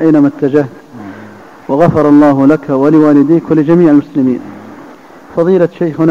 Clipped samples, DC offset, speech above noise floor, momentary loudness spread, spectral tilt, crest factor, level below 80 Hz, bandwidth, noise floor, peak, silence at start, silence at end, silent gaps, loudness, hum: 0.4%; under 0.1%; 26 dB; 22 LU; -9.5 dB/octave; 10 dB; -46 dBFS; 7 kHz; -34 dBFS; 0 dBFS; 0 s; 0 s; none; -9 LUFS; none